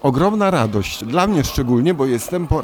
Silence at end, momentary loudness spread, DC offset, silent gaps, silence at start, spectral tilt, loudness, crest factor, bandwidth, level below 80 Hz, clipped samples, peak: 0 s; 4 LU; under 0.1%; none; 0.05 s; -6 dB/octave; -18 LUFS; 14 dB; 19 kHz; -32 dBFS; under 0.1%; -4 dBFS